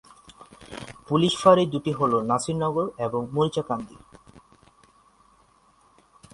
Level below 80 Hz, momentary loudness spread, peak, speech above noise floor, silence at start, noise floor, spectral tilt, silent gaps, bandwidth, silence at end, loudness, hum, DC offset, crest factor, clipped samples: -58 dBFS; 22 LU; -2 dBFS; 37 dB; 0.3 s; -60 dBFS; -6 dB/octave; none; 11.5 kHz; 2.45 s; -23 LUFS; none; under 0.1%; 24 dB; under 0.1%